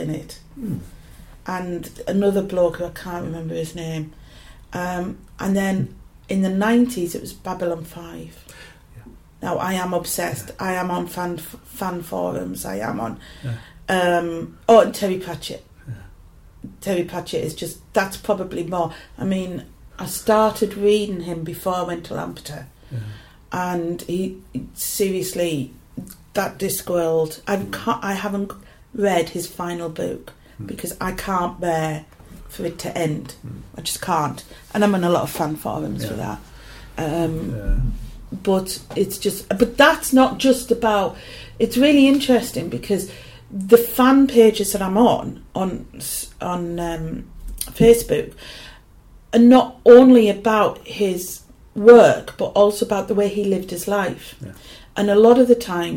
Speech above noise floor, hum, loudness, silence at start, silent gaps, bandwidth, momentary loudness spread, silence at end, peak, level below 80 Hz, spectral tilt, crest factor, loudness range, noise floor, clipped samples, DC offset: 28 dB; none; -19 LUFS; 0 s; none; 17 kHz; 20 LU; 0 s; 0 dBFS; -40 dBFS; -5 dB/octave; 20 dB; 12 LU; -47 dBFS; under 0.1%; under 0.1%